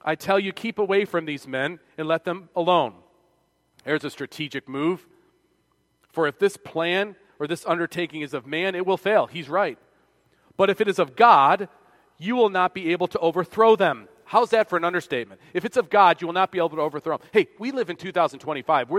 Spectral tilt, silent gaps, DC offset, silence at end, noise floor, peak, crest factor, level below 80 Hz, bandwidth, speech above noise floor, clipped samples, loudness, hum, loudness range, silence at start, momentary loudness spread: -5.5 dB/octave; none; under 0.1%; 0 s; -68 dBFS; -2 dBFS; 22 dB; -70 dBFS; 15 kHz; 45 dB; under 0.1%; -23 LUFS; none; 7 LU; 0.05 s; 13 LU